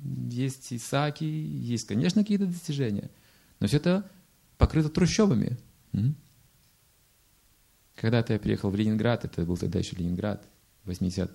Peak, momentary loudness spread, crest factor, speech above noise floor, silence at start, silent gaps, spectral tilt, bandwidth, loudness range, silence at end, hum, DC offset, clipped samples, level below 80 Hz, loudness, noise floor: -8 dBFS; 10 LU; 20 dB; 37 dB; 0 s; none; -6.5 dB/octave; 16 kHz; 3 LU; 0 s; none; under 0.1%; under 0.1%; -42 dBFS; -28 LUFS; -64 dBFS